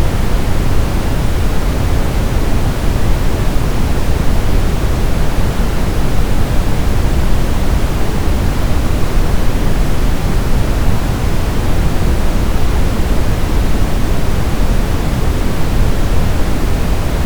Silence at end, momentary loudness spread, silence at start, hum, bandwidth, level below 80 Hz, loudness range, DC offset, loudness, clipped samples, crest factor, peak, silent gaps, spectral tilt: 0 s; 1 LU; 0 s; none; over 20 kHz; -14 dBFS; 0 LU; under 0.1%; -17 LUFS; under 0.1%; 10 dB; 0 dBFS; none; -6 dB/octave